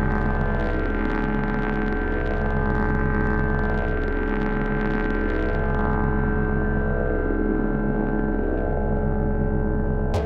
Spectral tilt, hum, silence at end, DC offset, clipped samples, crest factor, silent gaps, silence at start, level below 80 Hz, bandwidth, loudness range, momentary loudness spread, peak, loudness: -9.5 dB/octave; none; 0 s; under 0.1%; under 0.1%; 12 dB; none; 0 s; -26 dBFS; 5 kHz; 0 LU; 2 LU; -10 dBFS; -24 LUFS